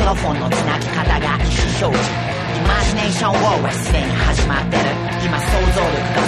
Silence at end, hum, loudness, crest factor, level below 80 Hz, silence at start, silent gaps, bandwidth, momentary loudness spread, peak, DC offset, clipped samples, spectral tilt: 0 s; none; -17 LUFS; 16 dB; -22 dBFS; 0 s; none; 13 kHz; 3 LU; -2 dBFS; under 0.1%; under 0.1%; -5 dB/octave